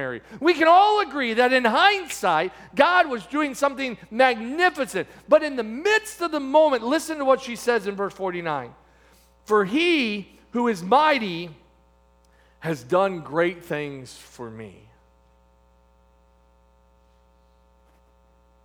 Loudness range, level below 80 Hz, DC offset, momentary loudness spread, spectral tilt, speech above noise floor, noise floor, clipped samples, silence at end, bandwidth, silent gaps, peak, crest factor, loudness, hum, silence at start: 9 LU; -60 dBFS; under 0.1%; 15 LU; -4 dB/octave; 36 dB; -58 dBFS; under 0.1%; 3.95 s; over 20 kHz; none; -2 dBFS; 22 dB; -22 LUFS; none; 0 s